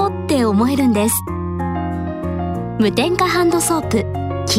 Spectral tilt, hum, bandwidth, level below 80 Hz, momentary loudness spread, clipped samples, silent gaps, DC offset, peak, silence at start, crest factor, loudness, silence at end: -5 dB/octave; none; 16 kHz; -38 dBFS; 8 LU; under 0.1%; none; under 0.1%; -2 dBFS; 0 s; 16 dB; -18 LUFS; 0 s